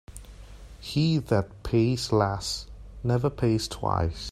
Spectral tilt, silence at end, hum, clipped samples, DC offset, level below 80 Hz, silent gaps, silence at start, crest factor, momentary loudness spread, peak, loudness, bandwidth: -6 dB/octave; 0 s; none; under 0.1%; under 0.1%; -44 dBFS; none; 0.1 s; 20 dB; 13 LU; -8 dBFS; -27 LUFS; 13.5 kHz